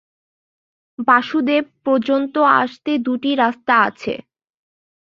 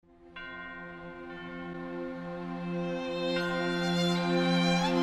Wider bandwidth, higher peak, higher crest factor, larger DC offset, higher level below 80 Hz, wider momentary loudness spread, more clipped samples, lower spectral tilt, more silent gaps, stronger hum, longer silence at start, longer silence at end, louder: second, 7.2 kHz vs 12 kHz; first, -2 dBFS vs -16 dBFS; about the same, 18 dB vs 16 dB; neither; second, -64 dBFS vs -58 dBFS; second, 8 LU vs 17 LU; neither; about the same, -6 dB/octave vs -5.5 dB/octave; neither; neither; first, 1 s vs 0.2 s; first, 0.85 s vs 0 s; first, -17 LUFS vs -31 LUFS